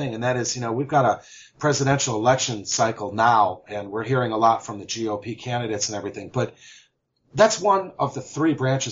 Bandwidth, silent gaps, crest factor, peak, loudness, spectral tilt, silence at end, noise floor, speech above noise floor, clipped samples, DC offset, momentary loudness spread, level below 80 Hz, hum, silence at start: 7.8 kHz; none; 20 dB; -4 dBFS; -23 LUFS; -4.5 dB/octave; 0 s; -65 dBFS; 42 dB; under 0.1%; under 0.1%; 11 LU; -60 dBFS; none; 0 s